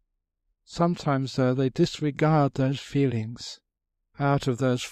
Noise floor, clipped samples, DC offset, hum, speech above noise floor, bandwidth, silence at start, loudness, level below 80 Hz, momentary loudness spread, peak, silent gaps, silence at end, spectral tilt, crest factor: -78 dBFS; under 0.1%; under 0.1%; none; 53 dB; 11 kHz; 0.7 s; -25 LUFS; -56 dBFS; 13 LU; -8 dBFS; none; 0 s; -7 dB/octave; 18 dB